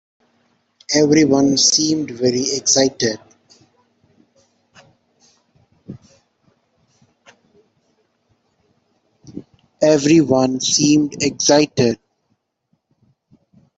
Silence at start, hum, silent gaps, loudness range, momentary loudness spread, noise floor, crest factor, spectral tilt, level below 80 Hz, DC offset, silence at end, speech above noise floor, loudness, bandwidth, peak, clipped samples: 0.9 s; none; none; 7 LU; 25 LU; -69 dBFS; 18 dB; -3.5 dB/octave; -58 dBFS; under 0.1%; 1.8 s; 54 dB; -15 LUFS; 8.4 kHz; -2 dBFS; under 0.1%